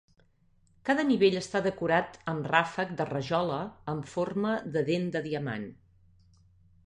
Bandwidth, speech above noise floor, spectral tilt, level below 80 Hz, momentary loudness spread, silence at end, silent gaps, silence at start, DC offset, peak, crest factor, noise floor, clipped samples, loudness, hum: 10.5 kHz; 36 dB; -6 dB/octave; -64 dBFS; 11 LU; 1.1 s; none; 0.85 s; under 0.1%; -8 dBFS; 24 dB; -65 dBFS; under 0.1%; -30 LUFS; none